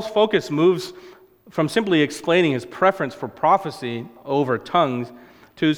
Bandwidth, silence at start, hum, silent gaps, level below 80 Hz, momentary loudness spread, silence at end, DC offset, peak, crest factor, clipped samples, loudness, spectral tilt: 16 kHz; 0 s; none; none; -62 dBFS; 11 LU; 0 s; under 0.1%; -2 dBFS; 18 dB; under 0.1%; -21 LUFS; -6 dB/octave